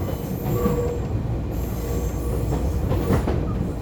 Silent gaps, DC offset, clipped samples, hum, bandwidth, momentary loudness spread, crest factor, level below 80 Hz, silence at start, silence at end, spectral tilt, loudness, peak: none; under 0.1%; under 0.1%; none; over 20 kHz; 5 LU; 16 dB; -28 dBFS; 0 s; 0 s; -7.5 dB/octave; -25 LUFS; -8 dBFS